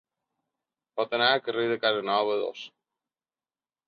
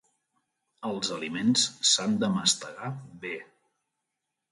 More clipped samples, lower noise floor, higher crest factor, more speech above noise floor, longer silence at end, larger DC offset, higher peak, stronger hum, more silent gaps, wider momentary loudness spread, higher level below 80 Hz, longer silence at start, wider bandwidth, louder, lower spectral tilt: neither; first, under -90 dBFS vs -84 dBFS; about the same, 20 dB vs 24 dB; first, over 64 dB vs 56 dB; about the same, 1.2 s vs 1.1 s; neither; second, -10 dBFS vs -6 dBFS; neither; neither; about the same, 15 LU vs 15 LU; second, -78 dBFS vs -72 dBFS; first, 0.95 s vs 0.8 s; second, 6.8 kHz vs 11.5 kHz; about the same, -26 LUFS vs -26 LUFS; first, -5 dB/octave vs -2.5 dB/octave